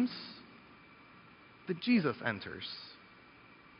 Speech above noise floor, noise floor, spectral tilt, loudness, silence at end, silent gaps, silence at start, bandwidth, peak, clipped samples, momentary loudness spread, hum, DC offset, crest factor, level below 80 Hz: 24 dB; -58 dBFS; -4 dB/octave; -35 LUFS; 0.25 s; none; 0 s; 5.4 kHz; -18 dBFS; under 0.1%; 27 LU; none; under 0.1%; 20 dB; -74 dBFS